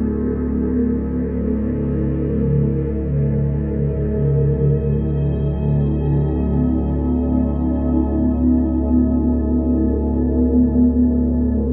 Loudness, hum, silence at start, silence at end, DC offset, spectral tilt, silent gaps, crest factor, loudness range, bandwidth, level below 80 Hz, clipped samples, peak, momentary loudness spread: -19 LUFS; none; 0 s; 0 s; under 0.1%; -14.5 dB/octave; none; 12 dB; 3 LU; 3.4 kHz; -24 dBFS; under 0.1%; -6 dBFS; 4 LU